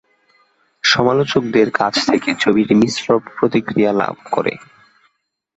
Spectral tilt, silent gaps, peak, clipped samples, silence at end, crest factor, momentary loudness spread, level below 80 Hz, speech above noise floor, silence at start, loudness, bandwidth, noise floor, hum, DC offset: -4.5 dB/octave; none; -2 dBFS; under 0.1%; 1 s; 16 dB; 7 LU; -54 dBFS; 48 dB; 0.85 s; -16 LUFS; 8.2 kHz; -64 dBFS; none; under 0.1%